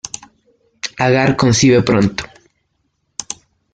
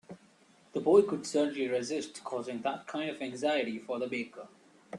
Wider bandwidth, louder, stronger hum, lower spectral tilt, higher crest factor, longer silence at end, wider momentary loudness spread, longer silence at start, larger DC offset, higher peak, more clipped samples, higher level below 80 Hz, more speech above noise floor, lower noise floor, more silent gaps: second, 9.6 kHz vs 11 kHz; first, -13 LUFS vs -32 LUFS; neither; about the same, -5 dB/octave vs -4.5 dB/octave; second, 16 dB vs 22 dB; first, 0.4 s vs 0 s; first, 19 LU vs 13 LU; about the same, 0.05 s vs 0.1 s; neither; first, -2 dBFS vs -12 dBFS; neither; first, -46 dBFS vs -78 dBFS; first, 54 dB vs 31 dB; first, -67 dBFS vs -63 dBFS; neither